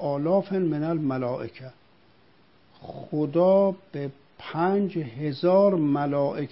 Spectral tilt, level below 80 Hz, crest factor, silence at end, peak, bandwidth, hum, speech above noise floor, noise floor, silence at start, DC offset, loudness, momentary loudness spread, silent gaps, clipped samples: -12 dB/octave; -66 dBFS; 16 dB; 0.05 s; -8 dBFS; 5.8 kHz; none; 35 dB; -60 dBFS; 0 s; 0.1%; -25 LUFS; 17 LU; none; under 0.1%